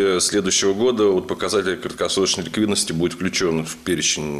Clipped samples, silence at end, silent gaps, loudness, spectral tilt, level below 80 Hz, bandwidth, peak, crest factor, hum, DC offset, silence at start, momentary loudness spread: under 0.1%; 0 s; none; -20 LUFS; -3 dB/octave; -52 dBFS; 14.5 kHz; -8 dBFS; 12 dB; none; under 0.1%; 0 s; 5 LU